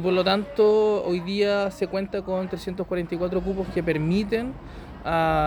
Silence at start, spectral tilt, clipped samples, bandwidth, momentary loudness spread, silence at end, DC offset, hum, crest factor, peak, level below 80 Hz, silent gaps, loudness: 0 s; -7 dB/octave; under 0.1%; 19 kHz; 10 LU; 0 s; under 0.1%; none; 16 dB; -8 dBFS; -44 dBFS; none; -24 LUFS